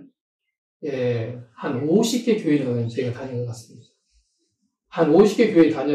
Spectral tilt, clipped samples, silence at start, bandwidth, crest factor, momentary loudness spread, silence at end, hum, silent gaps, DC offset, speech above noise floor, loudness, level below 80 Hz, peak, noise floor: -6.5 dB/octave; under 0.1%; 0 s; 14.5 kHz; 16 dB; 17 LU; 0 s; none; 0.21-0.39 s, 0.58-0.80 s; under 0.1%; 52 dB; -21 LUFS; -62 dBFS; -4 dBFS; -72 dBFS